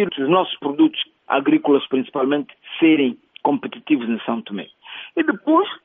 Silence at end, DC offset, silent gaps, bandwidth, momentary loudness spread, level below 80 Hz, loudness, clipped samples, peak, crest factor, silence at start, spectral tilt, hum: 0.1 s; under 0.1%; none; 3.8 kHz; 11 LU; -68 dBFS; -20 LUFS; under 0.1%; -4 dBFS; 16 dB; 0 s; -3 dB/octave; none